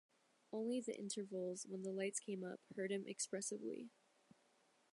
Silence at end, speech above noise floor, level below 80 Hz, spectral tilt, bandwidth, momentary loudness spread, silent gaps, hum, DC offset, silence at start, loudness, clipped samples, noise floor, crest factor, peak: 1.05 s; 31 dB; under -90 dBFS; -4 dB/octave; 11.5 kHz; 7 LU; none; none; under 0.1%; 0.5 s; -46 LUFS; under 0.1%; -77 dBFS; 18 dB; -30 dBFS